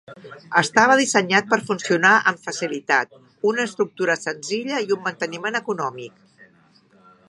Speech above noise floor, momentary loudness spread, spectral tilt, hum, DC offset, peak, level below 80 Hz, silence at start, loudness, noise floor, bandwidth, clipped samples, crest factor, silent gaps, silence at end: 35 dB; 12 LU; -3.5 dB/octave; none; under 0.1%; 0 dBFS; -74 dBFS; 0.1 s; -20 LUFS; -56 dBFS; 11.5 kHz; under 0.1%; 22 dB; none; 0.85 s